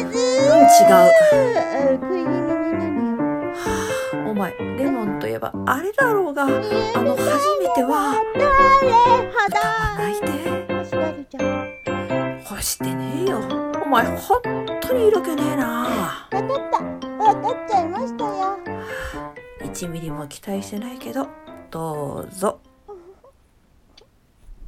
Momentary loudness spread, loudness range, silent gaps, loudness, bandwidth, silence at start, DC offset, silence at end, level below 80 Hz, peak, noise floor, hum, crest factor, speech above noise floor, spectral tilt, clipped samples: 16 LU; 13 LU; none; -19 LUFS; 17 kHz; 0 s; under 0.1%; 0 s; -44 dBFS; 0 dBFS; -56 dBFS; none; 20 dB; 37 dB; -4.5 dB/octave; under 0.1%